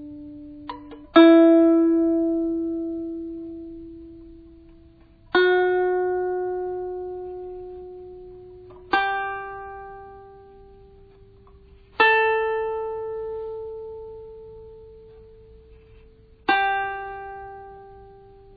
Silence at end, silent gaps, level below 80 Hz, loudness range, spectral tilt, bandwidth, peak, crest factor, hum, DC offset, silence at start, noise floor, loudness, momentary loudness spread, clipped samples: 0.45 s; none; -52 dBFS; 12 LU; -7.5 dB/octave; 4.9 kHz; -4 dBFS; 22 dB; none; under 0.1%; 0 s; -51 dBFS; -21 LUFS; 25 LU; under 0.1%